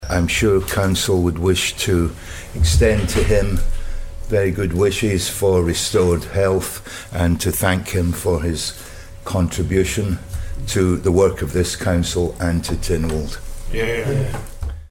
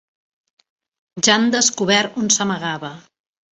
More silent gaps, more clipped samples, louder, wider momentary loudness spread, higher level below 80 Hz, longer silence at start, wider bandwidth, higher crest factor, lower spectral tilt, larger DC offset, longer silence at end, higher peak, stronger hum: neither; neither; about the same, -19 LUFS vs -17 LUFS; about the same, 13 LU vs 15 LU; first, -26 dBFS vs -62 dBFS; second, 0 s vs 1.15 s; first, 17.5 kHz vs 8.4 kHz; about the same, 16 dB vs 20 dB; first, -5 dB/octave vs -2 dB/octave; neither; second, 0.05 s vs 0.5 s; about the same, -2 dBFS vs -2 dBFS; neither